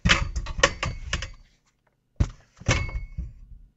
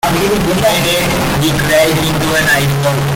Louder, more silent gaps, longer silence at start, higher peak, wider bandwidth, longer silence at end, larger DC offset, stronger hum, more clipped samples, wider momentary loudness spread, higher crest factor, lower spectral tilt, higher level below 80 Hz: second, -27 LUFS vs -12 LUFS; neither; about the same, 0.05 s vs 0.05 s; about the same, 0 dBFS vs -2 dBFS; second, 8.2 kHz vs 17 kHz; about the same, 0.1 s vs 0 s; neither; neither; neither; first, 17 LU vs 3 LU; first, 28 dB vs 10 dB; about the same, -3.5 dB/octave vs -4.5 dB/octave; about the same, -34 dBFS vs -30 dBFS